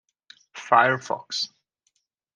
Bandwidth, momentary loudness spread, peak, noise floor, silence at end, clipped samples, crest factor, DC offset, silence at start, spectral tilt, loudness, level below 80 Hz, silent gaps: 10 kHz; 20 LU; -2 dBFS; -73 dBFS; 0.9 s; under 0.1%; 24 dB; under 0.1%; 0.55 s; -3 dB/octave; -23 LUFS; -78 dBFS; none